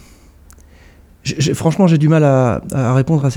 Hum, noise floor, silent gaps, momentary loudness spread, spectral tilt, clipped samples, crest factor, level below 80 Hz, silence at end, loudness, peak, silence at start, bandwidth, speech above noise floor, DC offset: none; -44 dBFS; none; 7 LU; -7 dB/octave; under 0.1%; 14 dB; -42 dBFS; 0 s; -14 LUFS; 0 dBFS; 1.25 s; 14.5 kHz; 31 dB; under 0.1%